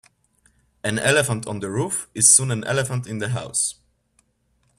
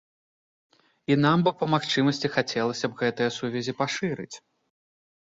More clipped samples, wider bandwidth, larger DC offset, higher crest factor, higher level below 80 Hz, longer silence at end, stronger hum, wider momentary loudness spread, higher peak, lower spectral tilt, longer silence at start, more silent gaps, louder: neither; first, 15 kHz vs 7.8 kHz; neither; about the same, 22 dB vs 20 dB; first, -56 dBFS vs -66 dBFS; first, 1.05 s vs 0.85 s; neither; about the same, 14 LU vs 12 LU; first, 0 dBFS vs -8 dBFS; second, -3 dB/octave vs -5.5 dB/octave; second, 0.85 s vs 1.1 s; neither; first, -20 LUFS vs -25 LUFS